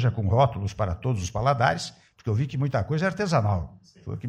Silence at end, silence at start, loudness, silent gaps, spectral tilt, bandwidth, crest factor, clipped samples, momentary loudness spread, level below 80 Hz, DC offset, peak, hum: 0 s; 0 s; -25 LUFS; none; -6.5 dB/octave; 10 kHz; 18 dB; under 0.1%; 14 LU; -46 dBFS; under 0.1%; -8 dBFS; none